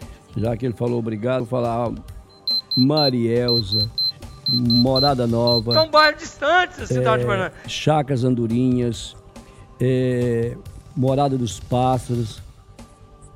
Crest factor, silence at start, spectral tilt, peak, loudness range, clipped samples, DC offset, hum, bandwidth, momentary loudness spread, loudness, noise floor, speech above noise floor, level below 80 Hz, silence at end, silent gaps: 18 dB; 0 s; -5.5 dB/octave; -2 dBFS; 5 LU; under 0.1%; under 0.1%; none; 13.5 kHz; 10 LU; -20 LUFS; -45 dBFS; 26 dB; -44 dBFS; 0.1 s; none